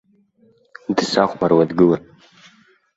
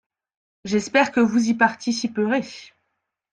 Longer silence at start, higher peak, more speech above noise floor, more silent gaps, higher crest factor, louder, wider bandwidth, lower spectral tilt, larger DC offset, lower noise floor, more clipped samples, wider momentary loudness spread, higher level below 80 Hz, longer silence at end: first, 0.9 s vs 0.65 s; about the same, -2 dBFS vs -4 dBFS; second, 40 dB vs 57 dB; neither; about the same, 18 dB vs 20 dB; first, -17 LUFS vs -21 LUFS; second, 8 kHz vs 9.2 kHz; first, -6 dB/octave vs -4.5 dB/octave; neither; second, -57 dBFS vs -77 dBFS; neither; second, 9 LU vs 16 LU; first, -56 dBFS vs -64 dBFS; first, 0.95 s vs 0.65 s